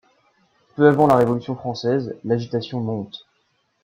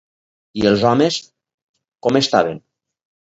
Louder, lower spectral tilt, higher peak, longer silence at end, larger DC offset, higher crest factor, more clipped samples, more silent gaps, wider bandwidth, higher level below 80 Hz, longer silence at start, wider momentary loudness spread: second, -20 LUFS vs -17 LUFS; first, -7.5 dB/octave vs -5 dB/octave; about the same, -2 dBFS vs 0 dBFS; about the same, 0.65 s vs 0.7 s; neither; about the same, 18 dB vs 18 dB; neither; second, none vs 1.54-1.74 s; first, 14.5 kHz vs 8 kHz; second, -58 dBFS vs -52 dBFS; first, 0.75 s vs 0.55 s; first, 16 LU vs 13 LU